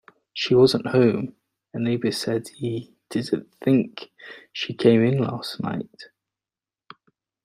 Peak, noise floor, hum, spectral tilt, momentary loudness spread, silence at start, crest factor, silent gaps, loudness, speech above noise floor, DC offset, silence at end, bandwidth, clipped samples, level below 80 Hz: -4 dBFS; under -90 dBFS; none; -6.5 dB/octave; 19 LU; 0.35 s; 20 dB; none; -23 LUFS; over 68 dB; under 0.1%; 1.4 s; 15 kHz; under 0.1%; -62 dBFS